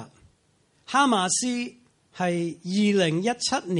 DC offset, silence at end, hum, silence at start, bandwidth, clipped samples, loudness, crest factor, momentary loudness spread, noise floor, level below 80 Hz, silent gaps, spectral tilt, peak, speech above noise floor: under 0.1%; 0 s; none; 0 s; 11.5 kHz; under 0.1%; -24 LUFS; 18 dB; 8 LU; -65 dBFS; -68 dBFS; none; -4 dB/octave; -8 dBFS; 41 dB